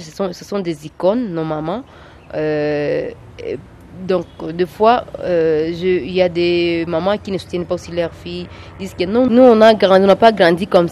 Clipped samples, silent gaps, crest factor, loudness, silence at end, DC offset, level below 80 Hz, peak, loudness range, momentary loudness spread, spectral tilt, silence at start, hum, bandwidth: under 0.1%; none; 16 dB; -15 LUFS; 0 s; under 0.1%; -46 dBFS; 0 dBFS; 8 LU; 18 LU; -6.5 dB/octave; 0 s; none; 13 kHz